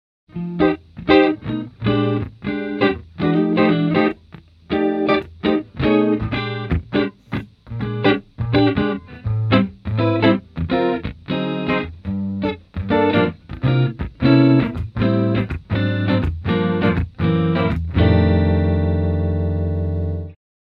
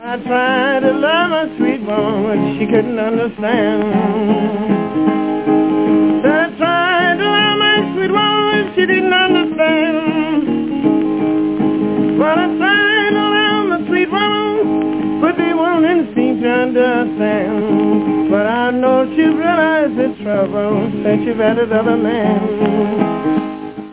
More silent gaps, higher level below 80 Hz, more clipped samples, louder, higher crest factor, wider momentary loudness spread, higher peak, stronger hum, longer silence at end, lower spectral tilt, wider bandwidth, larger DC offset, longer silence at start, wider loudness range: neither; first, -34 dBFS vs -54 dBFS; neither; second, -19 LUFS vs -14 LUFS; first, 18 dB vs 12 dB; first, 10 LU vs 5 LU; about the same, 0 dBFS vs -2 dBFS; neither; first, 0.3 s vs 0 s; about the same, -9.5 dB/octave vs -9.5 dB/octave; first, 5.4 kHz vs 4 kHz; second, under 0.1% vs 0.3%; first, 0.35 s vs 0 s; about the same, 3 LU vs 3 LU